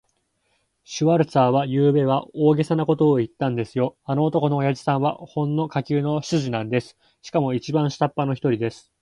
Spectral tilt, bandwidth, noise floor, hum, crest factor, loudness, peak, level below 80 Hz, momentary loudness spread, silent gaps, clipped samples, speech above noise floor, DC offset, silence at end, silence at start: -7.5 dB/octave; 11 kHz; -70 dBFS; none; 18 dB; -22 LUFS; -4 dBFS; -62 dBFS; 7 LU; none; under 0.1%; 48 dB; under 0.1%; 0.25 s; 0.9 s